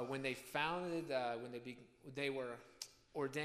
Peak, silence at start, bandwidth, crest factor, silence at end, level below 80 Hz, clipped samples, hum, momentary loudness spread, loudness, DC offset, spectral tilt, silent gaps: -24 dBFS; 0 s; 15.5 kHz; 20 dB; 0 s; -78 dBFS; under 0.1%; none; 13 LU; -43 LUFS; under 0.1%; -4.5 dB/octave; none